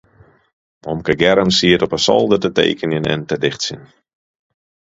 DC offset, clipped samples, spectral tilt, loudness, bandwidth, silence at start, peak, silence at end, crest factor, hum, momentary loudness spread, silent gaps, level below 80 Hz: under 0.1%; under 0.1%; -4.5 dB/octave; -16 LUFS; 8 kHz; 0.85 s; 0 dBFS; 1.1 s; 18 dB; none; 11 LU; none; -46 dBFS